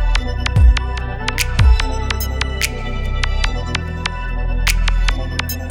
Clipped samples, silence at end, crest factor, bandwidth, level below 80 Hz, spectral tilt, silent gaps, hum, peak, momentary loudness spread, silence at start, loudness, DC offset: under 0.1%; 0 s; 16 dB; 20 kHz; -18 dBFS; -4 dB/octave; none; none; 0 dBFS; 9 LU; 0 s; -19 LUFS; under 0.1%